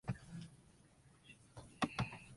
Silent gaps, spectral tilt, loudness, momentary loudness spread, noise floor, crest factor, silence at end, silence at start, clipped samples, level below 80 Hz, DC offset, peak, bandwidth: none; -5.5 dB/octave; -44 LUFS; 26 LU; -67 dBFS; 26 dB; 0 s; 0.05 s; under 0.1%; -64 dBFS; under 0.1%; -22 dBFS; 11.5 kHz